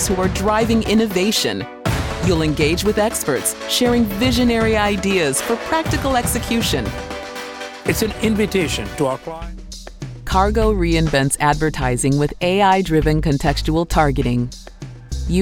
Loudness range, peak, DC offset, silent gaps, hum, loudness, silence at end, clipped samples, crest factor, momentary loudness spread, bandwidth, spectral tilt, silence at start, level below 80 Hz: 4 LU; -2 dBFS; 0.2%; none; none; -18 LUFS; 0 s; under 0.1%; 16 dB; 12 LU; 18 kHz; -4.5 dB/octave; 0 s; -30 dBFS